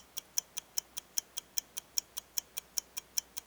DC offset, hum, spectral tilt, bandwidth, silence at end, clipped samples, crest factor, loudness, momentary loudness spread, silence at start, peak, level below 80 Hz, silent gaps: under 0.1%; none; 2 dB/octave; over 20 kHz; 0.05 s; under 0.1%; 30 dB; -37 LUFS; 2 LU; 0.15 s; -10 dBFS; -74 dBFS; none